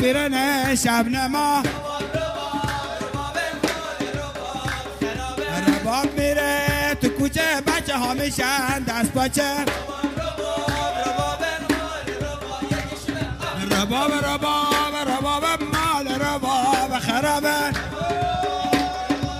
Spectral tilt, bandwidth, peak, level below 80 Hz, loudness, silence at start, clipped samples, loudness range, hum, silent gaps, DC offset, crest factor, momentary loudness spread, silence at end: -4 dB/octave; 15.5 kHz; -4 dBFS; -40 dBFS; -22 LUFS; 0 s; under 0.1%; 4 LU; none; none; under 0.1%; 18 dB; 8 LU; 0 s